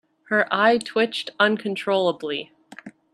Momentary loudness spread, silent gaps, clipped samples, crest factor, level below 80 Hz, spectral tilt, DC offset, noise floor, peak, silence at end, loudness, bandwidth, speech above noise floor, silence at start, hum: 11 LU; none; under 0.1%; 20 dB; -72 dBFS; -4.5 dB/octave; under 0.1%; -44 dBFS; -4 dBFS; 0.25 s; -22 LUFS; 12.5 kHz; 22 dB; 0.3 s; none